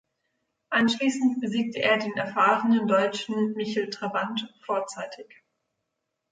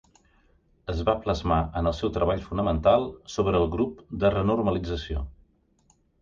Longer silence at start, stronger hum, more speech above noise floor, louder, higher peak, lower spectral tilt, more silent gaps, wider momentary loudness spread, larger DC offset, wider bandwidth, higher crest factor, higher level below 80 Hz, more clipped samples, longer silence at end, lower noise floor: second, 0.7 s vs 0.85 s; neither; first, 56 dB vs 40 dB; about the same, -25 LUFS vs -26 LUFS; about the same, -8 dBFS vs -8 dBFS; second, -4.5 dB/octave vs -7 dB/octave; neither; about the same, 10 LU vs 11 LU; neither; first, 9.4 kHz vs 7.4 kHz; about the same, 18 dB vs 18 dB; second, -74 dBFS vs -38 dBFS; neither; first, 1.1 s vs 0.9 s; first, -81 dBFS vs -65 dBFS